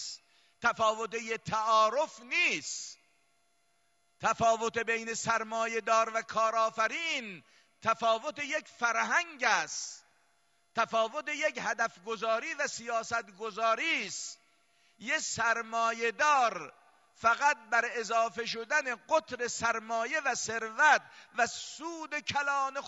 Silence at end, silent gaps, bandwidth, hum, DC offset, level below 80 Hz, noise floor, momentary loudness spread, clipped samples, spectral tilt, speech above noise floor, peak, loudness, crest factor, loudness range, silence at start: 0 s; none; 11.5 kHz; none; under 0.1%; -74 dBFS; -74 dBFS; 11 LU; under 0.1%; -1.5 dB/octave; 43 dB; -12 dBFS; -30 LUFS; 20 dB; 3 LU; 0 s